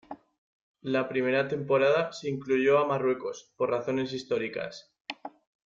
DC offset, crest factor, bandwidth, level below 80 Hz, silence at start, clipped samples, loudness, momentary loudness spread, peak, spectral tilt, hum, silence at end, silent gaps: under 0.1%; 16 dB; 7.6 kHz; -70 dBFS; 0.1 s; under 0.1%; -28 LUFS; 18 LU; -12 dBFS; -6 dB/octave; none; 0.4 s; 0.38-0.74 s, 5.00-5.05 s